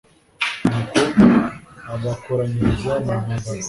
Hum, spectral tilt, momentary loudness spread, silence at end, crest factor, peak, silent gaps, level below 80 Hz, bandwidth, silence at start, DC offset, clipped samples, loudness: none; -6 dB/octave; 14 LU; 0 s; 18 dB; -2 dBFS; none; -40 dBFS; 11.5 kHz; 0.4 s; under 0.1%; under 0.1%; -19 LUFS